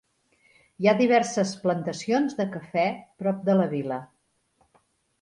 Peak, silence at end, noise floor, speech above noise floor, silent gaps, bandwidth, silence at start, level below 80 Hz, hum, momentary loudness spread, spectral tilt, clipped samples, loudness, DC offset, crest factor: -8 dBFS; 1.15 s; -68 dBFS; 44 dB; none; 11 kHz; 0.8 s; -70 dBFS; none; 9 LU; -6 dB/octave; under 0.1%; -25 LUFS; under 0.1%; 20 dB